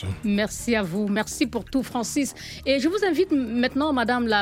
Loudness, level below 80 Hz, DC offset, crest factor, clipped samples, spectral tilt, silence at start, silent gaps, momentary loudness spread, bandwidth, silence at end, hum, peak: -24 LUFS; -48 dBFS; under 0.1%; 16 dB; under 0.1%; -4.5 dB/octave; 0 s; none; 5 LU; 16.5 kHz; 0 s; none; -8 dBFS